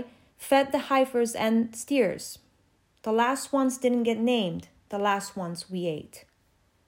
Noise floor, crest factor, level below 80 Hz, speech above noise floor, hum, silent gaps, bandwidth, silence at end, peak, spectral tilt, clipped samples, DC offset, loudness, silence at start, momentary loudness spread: -67 dBFS; 18 dB; -68 dBFS; 40 dB; none; none; 16 kHz; 0.65 s; -10 dBFS; -4.5 dB/octave; under 0.1%; under 0.1%; -27 LUFS; 0 s; 14 LU